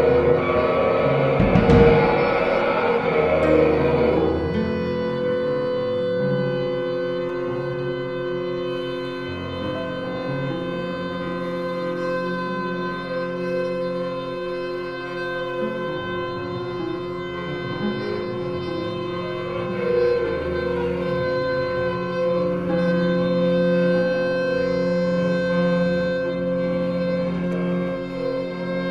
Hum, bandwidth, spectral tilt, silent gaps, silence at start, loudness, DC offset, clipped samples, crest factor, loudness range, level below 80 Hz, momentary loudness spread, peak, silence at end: none; 7.6 kHz; -8 dB/octave; none; 0 s; -22 LUFS; under 0.1%; under 0.1%; 18 dB; 9 LU; -42 dBFS; 9 LU; -4 dBFS; 0 s